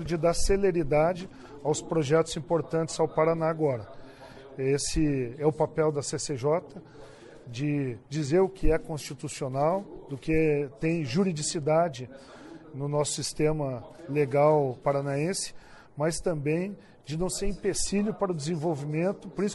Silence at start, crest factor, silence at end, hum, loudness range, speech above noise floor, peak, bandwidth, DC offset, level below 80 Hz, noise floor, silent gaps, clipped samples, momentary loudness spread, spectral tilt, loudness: 0 s; 18 dB; 0 s; none; 3 LU; 20 dB; -10 dBFS; 11.5 kHz; under 0.1%; -42 dBFS; -47 dBFS; none; under 0.1%; 15 LU; -5.5 dB/octave; -28 LUFS